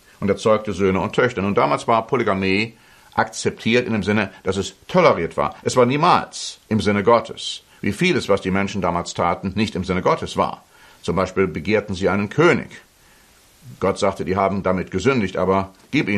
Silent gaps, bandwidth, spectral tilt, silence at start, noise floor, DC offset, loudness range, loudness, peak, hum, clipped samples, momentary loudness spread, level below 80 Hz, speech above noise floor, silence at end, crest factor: none; 13 kHz; -5.5 dB/octave; 0.2 s; -52 dBFS; under 0.1%; 3 LU; -20 LUFS; -2 dBFS; none; under 0.1%; 8 LU; -50 dBFS; 33 dB; 0 s; 18 dB